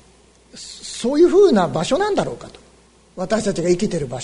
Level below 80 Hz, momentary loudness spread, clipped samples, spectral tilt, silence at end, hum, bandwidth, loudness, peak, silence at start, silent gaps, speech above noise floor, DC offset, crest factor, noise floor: -48 dBFS; 20 LU; under 0.1%; -5.5 dB/octave; 0 s; none; 11 kHz; -18 LUFS; -4 dBFS; 0.55 s; none; 33 dB; under 0.1%; 16 dB; -51 dBFS